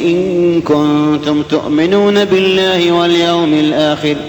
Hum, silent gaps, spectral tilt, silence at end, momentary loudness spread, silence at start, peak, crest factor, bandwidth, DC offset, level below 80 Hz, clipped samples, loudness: none; none; -6 dB/octave; 0 s; 3 LU; 0 s; -2 dBFS; 8 dB; 19.5 kHz; under 0.1%; -46 dBFS; under 0.1%; -11 LUFS